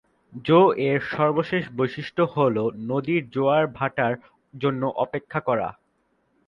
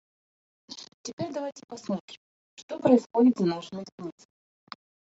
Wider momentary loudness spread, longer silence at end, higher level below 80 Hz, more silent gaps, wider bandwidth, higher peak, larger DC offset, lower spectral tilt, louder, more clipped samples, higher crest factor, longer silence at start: second, 9 LU vs 25 LU; second, 0.75 s vs 1 s; first, -62 dBFS vs -74 dBFS; second, none vs 0.94-1.04 s, 1.13-1.18 s, 1.64-1.68 s, 2.00-2.08 s, 2.17-2.57 s, 2.63-2.68 s, 3.06-3.10 s, 3.92-3.98 s; second, 7 kHz vs 7.8 kHz; about the same, -6 dBFS vs -8 dBFS; neither; first, -8.5 dB/octave vs -6.5 dB/octave; first, -23 LUFS vs -27 LUFS; neither; about the same, 18 dB vs 22 dB; second, 0.35 s vs 0.7 s